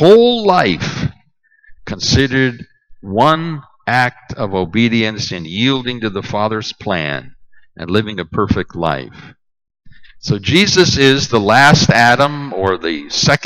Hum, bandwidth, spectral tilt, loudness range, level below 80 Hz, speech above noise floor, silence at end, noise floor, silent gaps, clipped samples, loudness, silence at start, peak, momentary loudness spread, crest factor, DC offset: none; 16 kHz; -4.5 dB/octave; 9 LU; -40 dBFS; 41 dB; 0 s; -55 dBFS; none; under 0.1%; -14 LUFS; 0 s; 0 dBFS; 14 LU; 14 dB; under 0.1%